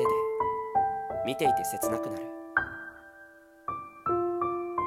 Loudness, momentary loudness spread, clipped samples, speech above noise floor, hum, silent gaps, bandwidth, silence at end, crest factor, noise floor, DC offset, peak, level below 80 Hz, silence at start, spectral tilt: -30 LUFS; 14 LU; under 0.1%; 24 dB; none; none; 16 kHz; 0 s; 20 dB; -53 dBFS; under 0.1%; -10 dBFS; -60 dBFS; 0 s; -4.5 dB/octave